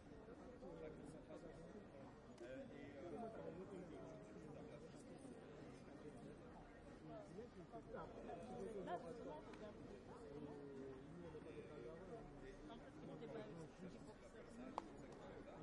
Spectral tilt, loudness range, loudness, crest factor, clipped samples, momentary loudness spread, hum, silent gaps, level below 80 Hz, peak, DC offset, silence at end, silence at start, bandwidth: -6.5 dB/octave; 4 LU; -57 LUFS; 26 dB; under 0.1%; 6 LU; none; none; -72 dBFS; -30 dBFS; under 0.1%; 0 s; 0 s; 11 kHz